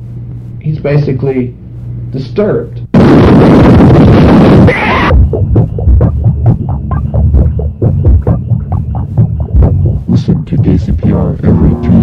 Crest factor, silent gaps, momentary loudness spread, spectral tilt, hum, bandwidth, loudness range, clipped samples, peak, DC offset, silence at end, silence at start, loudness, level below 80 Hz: 8 dB; none; 12 LU; -9.5 dB/octave; none; 6.6 kHz; 6 LU; 3%; 0 dBFS; under 0.1%; 0 s; 0 s; -8 LUFS; -16 dBFS